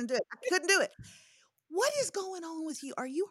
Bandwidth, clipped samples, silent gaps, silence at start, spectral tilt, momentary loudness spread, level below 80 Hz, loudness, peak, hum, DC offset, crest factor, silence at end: 16 kHz; under 0.1%; none; 0 s; -1.5 dB/octave; 12 LU; -74 dBFS; -32 LUFS; -14 dBFS; none; under 0.1%; 20 dB; 0 s